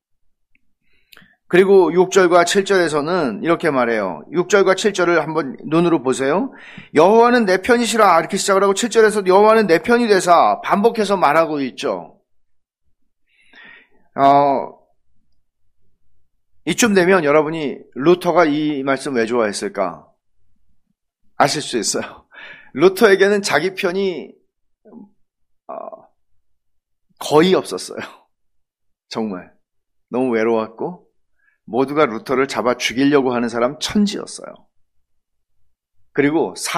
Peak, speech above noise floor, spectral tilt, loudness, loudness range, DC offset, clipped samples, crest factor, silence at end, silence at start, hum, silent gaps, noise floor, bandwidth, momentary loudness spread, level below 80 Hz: 0 dBFS; 53 dB; -4.5 dB/octave; -16 LUFS; 9 LU; under 0.1%; under 0.1%; 18 dB; 0 s; 1.5 s; none; none; -69 dBFS; 15.5 kHz; 14 LU; -58 dBFS